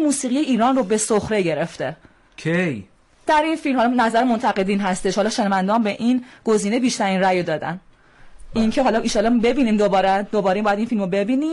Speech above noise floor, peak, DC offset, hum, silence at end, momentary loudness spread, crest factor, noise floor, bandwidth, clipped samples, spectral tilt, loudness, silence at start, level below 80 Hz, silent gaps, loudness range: 27 dB; -8 dBFS; under 0.1%; none; 0 s; 7 LU; 10 dB; -46 dBFS; 11.5 kHz; under 0.1%; -5 dB/octave; -20 LUFS; 0 s; -46 dBFS; none; 2 LU